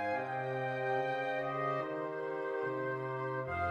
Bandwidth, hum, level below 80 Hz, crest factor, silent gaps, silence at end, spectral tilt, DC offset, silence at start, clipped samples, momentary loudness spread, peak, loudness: 9.2 kHz; none; -66 dBFS; 14 dB; none; 0 s; -7.5 dB/octave; under 0.1%; 0 s; under 0.1%; 4 LU; -22 dBFS; -36 LUFS